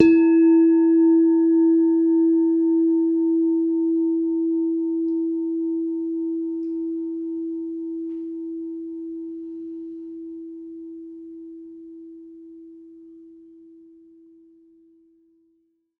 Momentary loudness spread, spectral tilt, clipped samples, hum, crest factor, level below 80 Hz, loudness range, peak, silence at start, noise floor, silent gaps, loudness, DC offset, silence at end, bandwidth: 23 LU; -8.5 dB/octave; under 0.1%; none; 22 dB; -66 dBFS; 22 LU; 0 dBFS; 0 s; -67 dBFS; none; -21 LUFS; under 0.1%; 2.7 s; 2.8 kHz